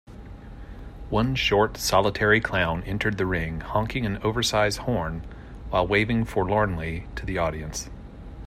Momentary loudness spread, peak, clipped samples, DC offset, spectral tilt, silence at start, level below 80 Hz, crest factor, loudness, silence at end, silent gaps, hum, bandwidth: 21 LU; -6 dBFS; under 0.1%; under 0.1%; -5 dB/octave; 0.1 s; -40 dBFS; 20 dB; -25 LUFS; 0 s; none; none; 15.5 kHz